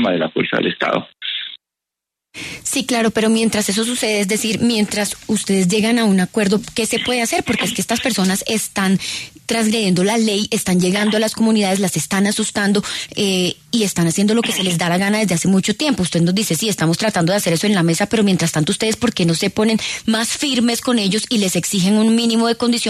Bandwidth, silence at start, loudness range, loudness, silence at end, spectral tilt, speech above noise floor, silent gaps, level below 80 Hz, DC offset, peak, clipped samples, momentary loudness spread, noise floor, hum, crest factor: 13.5 kHz; 0 s; 2 LU; -17 LUFS; 0 s; -4 dB/octave; 67 dB; none; -52 dBFS; under 0.1%; -4 dBFS; under 0.1%; 4 LU; -84 dBFS; none; 14 dB